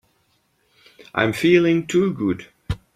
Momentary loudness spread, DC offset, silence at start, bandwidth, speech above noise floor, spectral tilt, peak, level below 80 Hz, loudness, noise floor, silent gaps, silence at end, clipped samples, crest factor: 15 LU; under 0.1%; 1 s; 14 kHz; 47 dB; -6 dB/octave; -2 dBFS; -46 dBFS; -19 LUFS; -65 dBFS; none; 0.2 s; under 0.1%; 20 dB